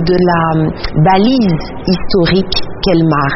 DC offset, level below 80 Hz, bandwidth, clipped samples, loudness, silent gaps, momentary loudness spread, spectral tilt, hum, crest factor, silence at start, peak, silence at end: under 0.1%; -28 dBFS; 6 kHz; under 0.1%; -12 LUFS; none; 7 LU; -5 dB/octave; none; 12 dB; 0 s; 0 dBFS; 0 s